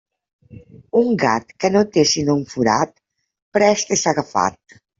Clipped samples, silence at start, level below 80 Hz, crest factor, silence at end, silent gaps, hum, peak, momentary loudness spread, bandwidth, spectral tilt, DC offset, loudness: under 0.1%; 0.55 s; -58 dBFS; 16 dB; 0.45 s; 3.42-3.52 s; none; -2 dBFS; 5 LU; 7.8 kHz; -4 dB/octave; under 0.1%; -18 LUFS